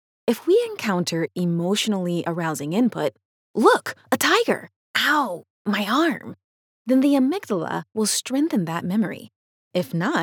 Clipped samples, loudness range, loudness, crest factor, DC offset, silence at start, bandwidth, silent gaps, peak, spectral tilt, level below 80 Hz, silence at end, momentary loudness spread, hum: under 0.1%; 2 LU; -22 LUFS; 20 dB; under 0.1%; 0.25 s; over 20 kHz; 3.25-3.54 s, 4.76-4.94 s, 5.50-5.65 s, 6.44-6.85 s, 9.36-9.71 s; -4 dBFS; -4.5 dB/octave; -86 dBFS; 0 s; 10 LU; none